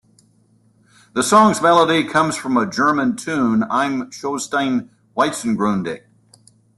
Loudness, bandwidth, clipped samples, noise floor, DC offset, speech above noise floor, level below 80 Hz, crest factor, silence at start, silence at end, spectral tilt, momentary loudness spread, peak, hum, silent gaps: -18 LUFS; 12.5 kHz; under 0.1%; -57 dBFS; under 0.1%; 39 dB; -58 dBFS; 18 dB; 1.15 s; 0.8 s; -4.5 dB/octave; 12 LU; -2 dBFS; none; none